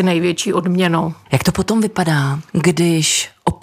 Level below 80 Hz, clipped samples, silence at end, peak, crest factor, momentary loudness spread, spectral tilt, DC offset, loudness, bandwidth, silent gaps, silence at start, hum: -44 dBFS; under 0.1%; 0.1 s; -2 dBFS; 14 dB; 5 LU; -4.5 dB/octave; under 0.1%; -16 LUFS; 16 kHz; none; 0 s; none